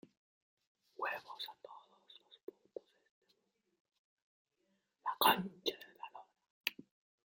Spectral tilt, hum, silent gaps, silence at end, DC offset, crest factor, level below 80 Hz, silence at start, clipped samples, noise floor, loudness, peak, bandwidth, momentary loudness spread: -3 dB/octave; none; 2.43-2.47 s, 3.10-3.22 s, 3.80-3.85 s, 3.98-4.45 s, 6.50-6.61 s; 0.55 s; under 0.1%; 28 dB; -86 dBFS; 1 s; under 0.1%; -82 dBFS; -38 LUFS; -16 dBFS; 16.5 kHz; 26 LU